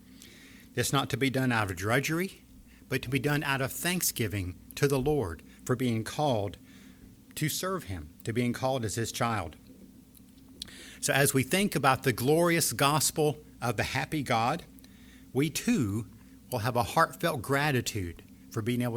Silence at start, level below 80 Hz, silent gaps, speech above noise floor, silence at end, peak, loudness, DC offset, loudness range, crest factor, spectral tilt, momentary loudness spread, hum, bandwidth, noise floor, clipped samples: 0.1 s; -56 dBFS; none; 25 dB; 0 s; -8 dBFS; -29 LUFS; under 0.1%; 6 LU; 22 dB; -4.5 dB/octave; 13 LU; none; over 20 kHz; -54 dBFS; under 0.1%